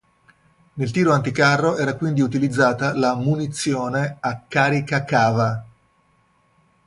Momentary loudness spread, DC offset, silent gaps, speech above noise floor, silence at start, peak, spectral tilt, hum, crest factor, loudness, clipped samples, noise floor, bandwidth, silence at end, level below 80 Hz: 7 LU; under 0.1%; none; 42 dB; 0.75 s; -2 dBFS; -6 dB/octave; none; 18 dB; -20 LUFS; under 0.1%; -61 dBFS; 11.5 kHz; 1.2 s; -56 dBFS